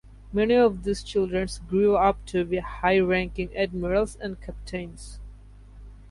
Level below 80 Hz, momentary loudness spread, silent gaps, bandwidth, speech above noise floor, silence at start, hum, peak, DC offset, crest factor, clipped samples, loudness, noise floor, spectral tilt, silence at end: -42 dBFS; 15 LU; none; 11.5 kHz; 22 dB; 0.05 s; none; -8 dBFS; under 0.1%; 18 dB; under 0.1%; -25 LUFS; -46 dBFS; -6 dB/octave; 0 s